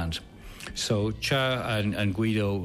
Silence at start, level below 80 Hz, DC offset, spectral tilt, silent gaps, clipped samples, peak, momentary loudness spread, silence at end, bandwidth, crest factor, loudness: 0 s; -46 dBFS; under 0.1%; -5 dB/octave; none; under 0.1%; -14 dBFS; 12 LU; 0 s; 15 kHz; 12 dB; -27 LUFS